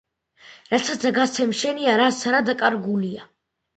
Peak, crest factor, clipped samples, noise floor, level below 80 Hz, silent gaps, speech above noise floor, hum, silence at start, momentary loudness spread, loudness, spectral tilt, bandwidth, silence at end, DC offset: -4 dBFS; 18 dB; under 0.1%; -51 dBFS; -66 dBFS; none; 30 dB; none; 0.45 s; 7 LU; -21 LUFS; -3.5 dB/octave; 9 kHz; 0.55 s; under 0.1%